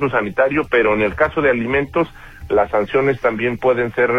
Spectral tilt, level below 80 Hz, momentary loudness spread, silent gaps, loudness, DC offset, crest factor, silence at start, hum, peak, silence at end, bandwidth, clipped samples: -7.5 dB/octave; -40 dBFS; 4 LU; none; -17 LUFS; under 0.1%; 14 dB; 0 s; none; -2 dBFS; 0 s; 7.2 kHz; under 0.1%